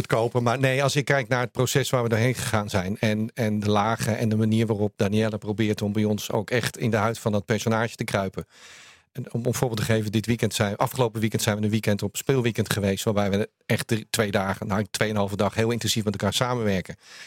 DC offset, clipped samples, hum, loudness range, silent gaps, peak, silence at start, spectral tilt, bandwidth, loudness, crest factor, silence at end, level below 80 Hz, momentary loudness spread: under 0.1%; under 0.1%; none; 3 LU; none; 0 dBFS; 0 s; -5 dB/octave; 17 kHz; -25 LUFS; 24 dB; 0 s; -58 dBFS; 4 LU